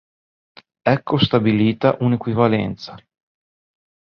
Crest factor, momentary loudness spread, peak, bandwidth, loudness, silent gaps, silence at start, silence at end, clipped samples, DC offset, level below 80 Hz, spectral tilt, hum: 18 dB; 10 LU; -2 dBFS; 6.4 kHz; -18 LUFS; none; 0.85 s; 1.15 s; under 0.1%; under 0.1%; -52 dBFS; -8.5 dB/octave; none